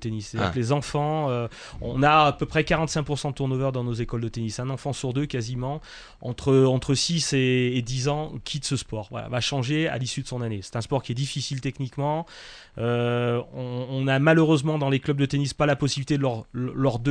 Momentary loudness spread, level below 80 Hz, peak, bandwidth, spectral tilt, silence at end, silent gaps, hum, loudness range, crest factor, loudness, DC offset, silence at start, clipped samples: 11 LU; -46 dBFS; -6 dBFS; 10.5 kHz; -5.5 dB/octave; 0 s; none; none; 5 LU; 18 dB; -25 LUFS; under 0.1%; 0 s; under 0.1%